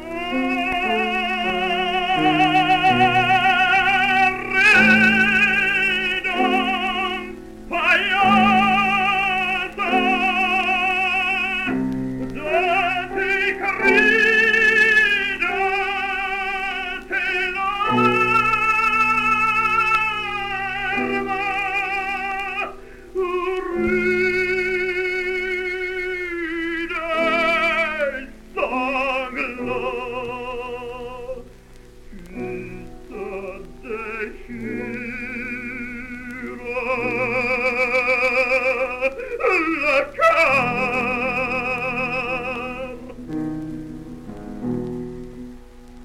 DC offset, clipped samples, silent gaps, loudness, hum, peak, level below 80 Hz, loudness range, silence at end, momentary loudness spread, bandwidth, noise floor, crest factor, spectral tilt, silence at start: under 0.1%; under 0.1%; none; -19 LUFS; none; -4 dBFS; -44 dBFS; 14 LU; 0 s; 16 LU; 16 kHz; -43 dBFS; 16 dB; -4.5 dB/octave; 0 s